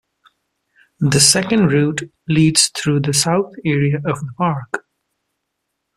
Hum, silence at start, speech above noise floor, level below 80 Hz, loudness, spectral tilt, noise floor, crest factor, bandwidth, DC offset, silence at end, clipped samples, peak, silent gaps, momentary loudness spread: none; 1 s; 59 dB; -52 dBFS; -16 LUFS; -4 dB/octave; -75 dBFS; 18 dB; 14.5 kHz; under 0.1%; 1.2 s; under 0.1%; 0 dBFS; none; 12 LU